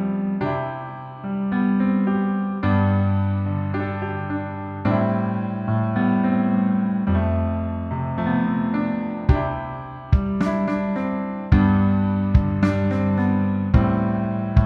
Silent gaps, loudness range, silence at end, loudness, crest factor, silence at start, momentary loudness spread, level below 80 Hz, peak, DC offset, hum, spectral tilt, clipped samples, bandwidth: none; 3 LU; 0 s; -22 LUFS; 18 dB; 0 s; 8 LU; -32 dBFS; -2 dBFS; under 0.1%; none; -10 dB/octave; under 0.1%; 5.8 kHz